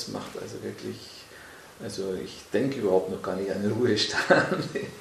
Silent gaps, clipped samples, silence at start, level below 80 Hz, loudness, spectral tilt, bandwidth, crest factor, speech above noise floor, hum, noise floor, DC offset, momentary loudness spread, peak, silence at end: none; under 0.1%; 0 s; -60 dBFS; -27 LUFS; -4.5 dB/octave; 14 kHz; 24 dB; 19 dB; none; -47 dBFS; under 0.1%; 20 LU; -4 dBFS; 0 s